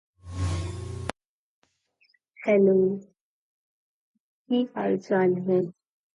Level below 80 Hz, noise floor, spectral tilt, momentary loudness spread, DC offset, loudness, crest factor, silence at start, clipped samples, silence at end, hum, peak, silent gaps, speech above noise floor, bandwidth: -46 dBFS; -68 dBFS; -7.5 dB/octave; 15 LU; under 0.1%; -26 LUFS; 18 dB; 0.25 s; under 0.1%; 0.45 s; none; -10 dBFS; 1.26-1.62 s, 3.21-4.14 s, 4.20-4.45 s; 45 dB; 11.5 kHz